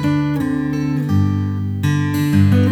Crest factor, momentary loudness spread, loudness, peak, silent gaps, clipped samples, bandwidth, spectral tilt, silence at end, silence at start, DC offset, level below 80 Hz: 14 dB; 6 LU; -18 LUFS; -2 dBFS; none; under 0.1%; 15.5 kHz; -7.5 dB/octave; 0 s; 0 s; under 0.1%; -44 dBFS